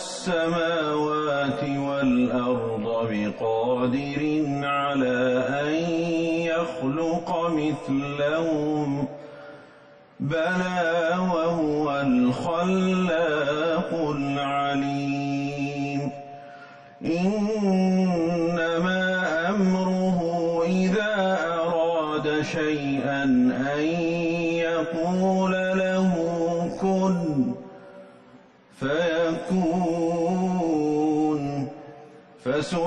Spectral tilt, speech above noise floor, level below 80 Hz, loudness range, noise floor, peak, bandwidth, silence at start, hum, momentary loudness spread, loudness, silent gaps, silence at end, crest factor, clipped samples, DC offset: -6.5 dB/octave; 28 dB; -58 dBFS; 3 LU; -52 dBFS; -12 dBFS; 10 kHz; 0 s; none; 6 LU; -24 LUFS; none; 0 s; 12 dB; under 0.1%; under 0.1%